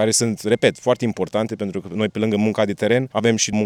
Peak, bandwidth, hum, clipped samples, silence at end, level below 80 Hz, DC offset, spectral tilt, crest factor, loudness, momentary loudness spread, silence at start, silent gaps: -2 dBFS; 15.5 kHz; none; under 0.1%; 0 s; -60 dBFS; under 0.1%; -4.5 dB/octave; 18 dB; -20 LUFS; 6 LU; 0 s; none